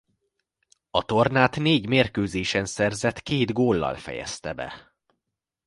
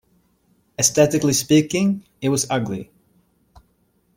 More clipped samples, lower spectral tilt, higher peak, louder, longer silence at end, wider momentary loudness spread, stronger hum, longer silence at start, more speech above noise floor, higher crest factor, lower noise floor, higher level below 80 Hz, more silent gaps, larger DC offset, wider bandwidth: neither; about the same, -5 dB/octave vs -4 dB/octave; about the same, -2 dBFS vs -2 dBFS; second, -24 LUFS vs -19 LUFS; second, 0.85 s vs 1.35 s; about the same, 12 LU vs 12 LU; neither; first, 0.95 s vs 0.8 s; first, 60 dB vs 45 dB; about the same, 22 dB vs 20 dB; first, -84 dBFS vs -64 dBFS; first, -50 dBFS vs -56 dBFS; neither; neither; second, 11.5 kHz vs 16.5 kHz